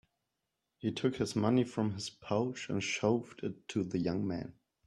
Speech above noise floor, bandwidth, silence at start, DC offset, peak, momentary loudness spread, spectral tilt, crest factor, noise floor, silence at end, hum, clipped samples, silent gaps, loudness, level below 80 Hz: 52 dB; 12 kHz; 0.85 s; under 0.1%; -14 dBFS; 11 LU; -5.5 dB/octave; 20 dB; -86 dBFS; 0.35 s; none; under 0.1%; none; -35 LUFS; -68 dBFS